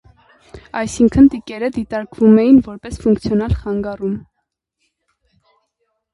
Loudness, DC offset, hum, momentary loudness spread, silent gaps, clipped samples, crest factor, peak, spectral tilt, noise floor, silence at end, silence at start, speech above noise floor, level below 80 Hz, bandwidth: -15 LUFS; under 0.1%; none; 14 LU; none; under 0.1%; 16 dB; 0 dBFS; -7.5 dB/octave; -74 dBFS; 1.95 s; 0.55 s; 60 dB; -36 dBFS; 11.5 kHz